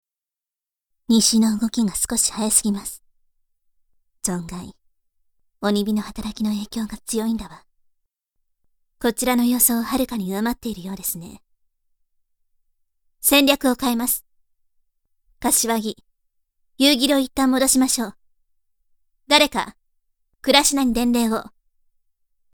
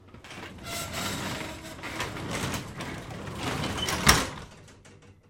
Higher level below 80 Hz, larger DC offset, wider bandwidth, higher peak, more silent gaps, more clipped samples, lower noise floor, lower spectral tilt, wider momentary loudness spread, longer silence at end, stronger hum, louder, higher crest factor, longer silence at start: about the same, -48 dBFS vs -46 dBFS; neither; first, over 20 kHz vs 16.5 kHz; about the same, 0 dBFS vs -2 dBFS; neither; neither; first, -90 dBFS vs -53 dBFS; about the same, -2.5 dB/octave vs -3 dB/octave; second, 14 LU vs 20 LU; first, 1.05 s vs 0.15 s; neither; first, -20 LUFS vs -29 LUFS; second, 22 dB vs 30 dB; first, 1.1 s vs 0 s